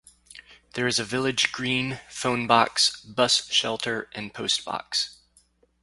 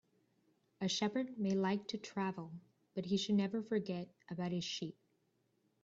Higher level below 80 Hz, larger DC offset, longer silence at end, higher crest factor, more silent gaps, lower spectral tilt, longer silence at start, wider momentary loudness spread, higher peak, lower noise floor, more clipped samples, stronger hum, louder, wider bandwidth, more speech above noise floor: first, -62 dBFS vs -80 dBFS; neither; second, 0.7 s vs 0.9 s; first, 24 dB vs 16 dB; neither; second, -2.5 dB/octave vs -5.5 dB/octave; second, 0.35 s vs 0.8 s; second, 10 LU vs 13 LU; first, -4 dBFS vs -24 dBFS; second, -63 dBFS vs -79 dBFS; neither; neither; first, -24 LUFS vs -39 LUFS; first, 11.5 kHz vs 7.8 kHz; second, 37 dB vs 41 dB